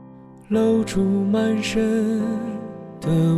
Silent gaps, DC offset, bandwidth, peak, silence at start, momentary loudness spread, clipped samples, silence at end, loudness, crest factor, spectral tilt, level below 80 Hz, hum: none; under 0.1%; 13.5 kHz; -10 dBFS; 0 s; 11 LU; under 0.1%; 0 s; -21 LUFS; 12 dB; -7 dB/octave; -46 dBFS; none